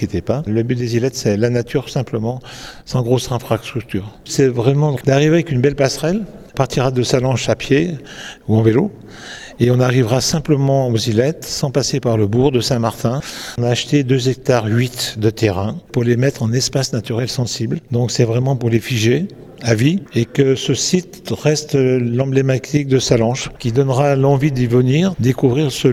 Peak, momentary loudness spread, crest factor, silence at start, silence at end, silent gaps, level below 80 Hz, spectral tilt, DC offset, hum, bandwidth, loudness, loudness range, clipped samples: 0 dBFS; 8 LU; 16 dB; 0 s; 0 s; none; -44 dBFS; -5.5 dB/octave; under 0.1%; none; 15 kHz; -17 LUFS; 3 LU; under 0.1%